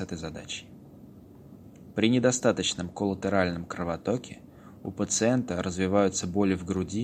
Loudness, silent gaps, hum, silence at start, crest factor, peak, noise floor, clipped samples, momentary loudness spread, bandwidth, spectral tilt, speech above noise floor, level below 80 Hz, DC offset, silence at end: -28 LUFS; none; none; 0 s; 22 dB; -8 dBFS; -49 dBFS; under 0.1%; 14 LU; 15.5 kHz; -4.5 dB/octave; 22 dB; -56 dBFS; under 0.1%; 0 s